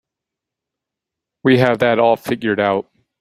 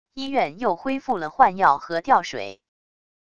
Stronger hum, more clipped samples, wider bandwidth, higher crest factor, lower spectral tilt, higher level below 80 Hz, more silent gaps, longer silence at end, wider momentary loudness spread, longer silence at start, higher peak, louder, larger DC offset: neither; neither; first, 15.5 kHz vs 7.8 kHz; about the same, 18 dB vs 22 dB; first, -7 dB/octave vs -4.5 dB/octave; about the same, -58 dBFS vs -60 dBFS; neither; second, 0.4 s vs 0.8 s; second, 7 LU vs 12 LU; first, 1.45 s vs 0.15 s; about the same, -2 dBFS vs -2 dBFS; first, -16 LUFS vs -22 LUFS; second, under 0.1% vs 0.5%